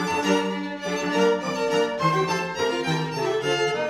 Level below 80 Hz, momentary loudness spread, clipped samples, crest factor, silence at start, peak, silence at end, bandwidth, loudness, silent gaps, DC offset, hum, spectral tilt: -60 dBFS; 5 LU; under 0.1%; 16 dB; 0 s; -8 dBFS; 0 s; 15 kHz; -24 LUFS; none; under 0.1%; none; -4.5 dB/octave